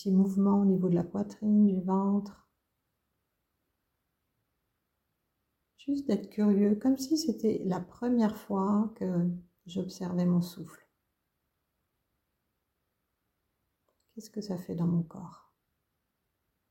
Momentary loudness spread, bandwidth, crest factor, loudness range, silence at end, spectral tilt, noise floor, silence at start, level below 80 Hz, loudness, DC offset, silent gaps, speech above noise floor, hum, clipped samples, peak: 16 LU; 16.5 kHz; 16 dB; 11 LU; 1.35 s; -8 dB/octave; -82 dBFS; 0 s; -68 dBFS; -29 LUFS; under 0.1%; none; 53 dB; none; under 0.1%; -16 dBFS